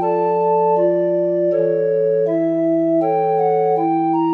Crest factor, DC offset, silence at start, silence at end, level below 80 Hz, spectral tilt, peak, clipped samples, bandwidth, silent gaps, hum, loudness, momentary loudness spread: 10 dB; under 0.1%; 0 s; 0 s; -78 dBFS; -10.5 dB/octave; -6 dBFS; under 0.1%; 4.1 kHz; none; none; -17 LUFS; 2 LU